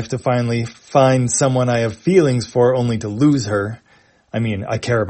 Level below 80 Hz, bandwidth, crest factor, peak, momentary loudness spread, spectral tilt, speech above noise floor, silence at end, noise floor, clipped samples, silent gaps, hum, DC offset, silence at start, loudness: -52 dBFS; 8.8 kHz; 16 dB; 0 dBFS; 9 LU; -6 dB/octave; 32 dB; 0 s; -49 dBFS; under 0.1%; none; none; under 0.1%; 0 s; -17 LUFS